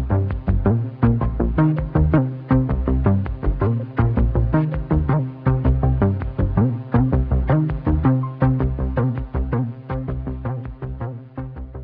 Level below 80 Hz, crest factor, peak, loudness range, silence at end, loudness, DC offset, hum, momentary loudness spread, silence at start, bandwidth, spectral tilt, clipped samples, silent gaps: -26 dBFS; 16 dB; -4 dBFS; 3 LU; 0 s; -21 LUFS; under 0.1%; none; 9 LU; 0 s; 4.2 kHz; -13 dB/octave; under 0.1%; none